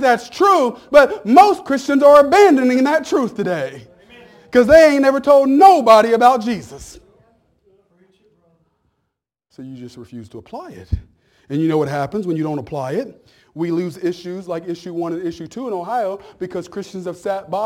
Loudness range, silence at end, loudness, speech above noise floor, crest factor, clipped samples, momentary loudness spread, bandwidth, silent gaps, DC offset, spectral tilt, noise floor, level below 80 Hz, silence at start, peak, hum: 13 LU; 0 s; -15 LUFS; 61 dB; 16 dB; under 0.1%; 22 LU; 17 kHz; none; under 0.1%; -5.5 dB/octave; -76 dBFS; -44 dBFS; 0 s; 0 dBFS; none